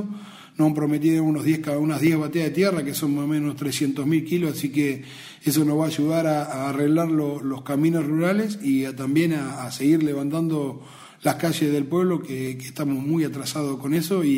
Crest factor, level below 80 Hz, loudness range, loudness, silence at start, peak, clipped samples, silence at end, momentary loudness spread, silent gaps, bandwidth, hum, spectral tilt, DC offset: 16 dB; -64 dBFS; 2 LU; -23 LUFS; 0 s; -6 dBFS; under 0.1%; 0 s; 7 LU; none; 16 kHz; none; -6 dB/octave; under 0.1%